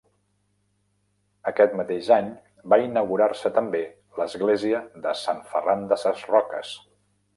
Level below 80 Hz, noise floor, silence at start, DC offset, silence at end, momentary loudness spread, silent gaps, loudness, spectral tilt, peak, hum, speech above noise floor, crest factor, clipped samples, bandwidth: -68 dBFS; -70 dBFS; 1.45 s; under 0.1%; 0.6 s; 12 LU; none; -24 LUFS; -5.5 dB/octave; -4 dBFS; 50 Hz at -55 dBFS; 47 dB; 20 dB; under 0.1%; 11.5 kHz